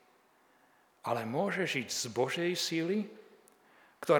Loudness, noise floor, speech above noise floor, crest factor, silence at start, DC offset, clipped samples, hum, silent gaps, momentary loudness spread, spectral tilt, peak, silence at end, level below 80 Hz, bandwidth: -34 LUFS; -67 dBFS; 33 dB; 24 dB; 1.05 s; under 0.1%; under 0.1%; none; none; 8 LU; -4 dB/octave; -12 dBFS; 0 s; -88 dBFS; 20 kHz